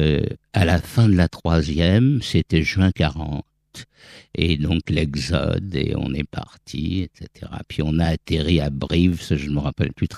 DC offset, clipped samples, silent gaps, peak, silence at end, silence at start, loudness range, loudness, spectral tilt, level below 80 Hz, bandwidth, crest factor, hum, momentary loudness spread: under 0.1%; under 0.1%; none; 0 dBFS; 0 s; 0 s; 6 LU; -21 LUFS; -7 dB/octave; -34 dBFS; 13.5 kHz; 20 dB; none; 15 LU